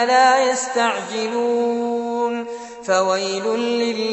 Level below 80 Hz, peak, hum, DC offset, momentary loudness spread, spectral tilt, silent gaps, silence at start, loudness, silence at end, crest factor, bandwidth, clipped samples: -68 dBFS; -2 dBFS; none; under 0.1%; 9 LU; -2.5 dB/octave; none; 0 s; -19 LUFS; 0 s; 16 dB; 8.4 kHz; under 0.1%